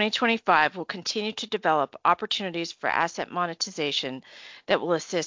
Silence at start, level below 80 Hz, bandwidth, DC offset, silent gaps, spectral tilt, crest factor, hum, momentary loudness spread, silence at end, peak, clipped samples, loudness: 0 s; -70 dBFS; 7.8 kHz; under 0.1%; none; -3 dB/octave; 20 dB; none; 10 LU; 0 s; -6 dBFS; under 0.1%; -26 LUFS